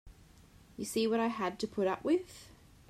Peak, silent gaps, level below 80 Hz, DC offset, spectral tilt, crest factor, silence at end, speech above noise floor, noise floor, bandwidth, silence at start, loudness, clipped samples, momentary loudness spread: -20 dBFS; none; -64 dBFS; under 0.1%; -4.5 dB/octave; 16 dB; 0.4 s; 26 dB; -59 dBFS; 15 kHz; 0.05 s; -34 LUFS; under 0.1%; 20 LU